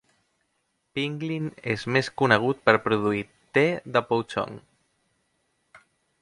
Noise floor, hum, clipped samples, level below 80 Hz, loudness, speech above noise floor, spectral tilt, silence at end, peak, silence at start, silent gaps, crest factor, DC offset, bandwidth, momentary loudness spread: -74 dBFS; none; under 0.1%; -64 dBFS; -25 LUFS; 50 dB; -6 dB/octave; 0.45 s; -2 dBFS; 0.95 s; none; 26 dB; under 0.1%; 11.5 kHz; 10 LU